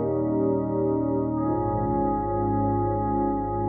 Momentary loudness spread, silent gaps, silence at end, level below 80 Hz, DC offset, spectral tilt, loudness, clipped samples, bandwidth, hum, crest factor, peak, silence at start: 1 LU; none; 0 s; -40 dBFS; under 0.1%; -13 dB/octave; -25 LUFS; under 0.1%; 2.3 kHz; none; 12 dB; -14 dBFS; 0 s